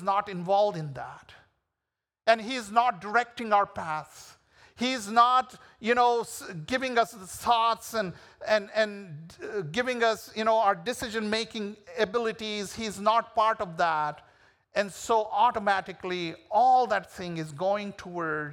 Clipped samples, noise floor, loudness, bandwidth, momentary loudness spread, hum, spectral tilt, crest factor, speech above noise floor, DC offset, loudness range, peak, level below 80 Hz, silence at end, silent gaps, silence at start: under 0.1%; -88 dBFS; -27 LUFS; 18.5 kHz; 13 LU; none; -4 dB/octave; 20 dB; 60 dB; under 0.1%; 2 LU; -8 dBFS; -66 dBFS; 0 s; none; 0 s